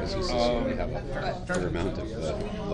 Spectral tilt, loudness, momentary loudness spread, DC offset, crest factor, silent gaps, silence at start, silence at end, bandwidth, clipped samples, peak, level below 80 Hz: -6 dB/octave; -30 LUFS; 6 LU; under 0.1%; 16 dB; none; 0 s; 0 s; 10.5 kHz; under 0.1%; -12 dBFS; -38 dBFS